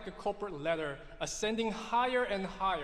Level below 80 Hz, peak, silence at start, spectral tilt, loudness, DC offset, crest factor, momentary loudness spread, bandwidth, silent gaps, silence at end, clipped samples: -54 dBFS; -18 dBFS; 0 s; -3.5 dB/octave; -34 LUFS; under 0.1%; 16 dB; 8 LU; 13.5 kHz; none; 0 s; under 0.1%